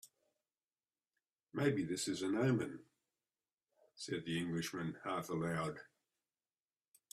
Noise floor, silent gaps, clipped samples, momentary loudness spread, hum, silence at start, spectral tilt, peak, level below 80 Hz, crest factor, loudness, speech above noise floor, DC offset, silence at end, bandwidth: under -90 dBFS; 1.32-1.36 s, 3.52-3.57 s; under 0.1%; 11 LU; none; 0.05 s; -5.5 dB/octave; -22 dBFS; -76 dBFS; 20 dB; -40 LUFS; over 51 dB; under 0.1%; 1.3 s; 15 kHz